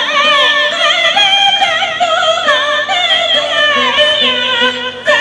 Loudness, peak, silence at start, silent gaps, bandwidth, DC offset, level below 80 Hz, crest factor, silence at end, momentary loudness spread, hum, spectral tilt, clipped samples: -9 LUFS; 0 dBFS; 0 s; none; 10.5 kHz; under 0.1%; -54 dBFS; 12 dB; 0 s; 4 LU; none; -0.5 dB/octave; under 0.1%